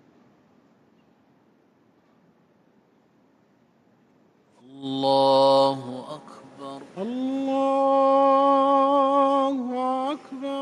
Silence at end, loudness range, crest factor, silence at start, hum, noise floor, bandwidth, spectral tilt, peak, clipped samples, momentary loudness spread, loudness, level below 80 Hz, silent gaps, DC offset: 0 s; 5 LU; 16 dB; 4.75 s; none; -62 dBFS; 11 kHz; -6 dB/octave; -8 dBFS; under 0.1%; 20 LU; -21 LUFS; -78 dBFS; none; under 0.1%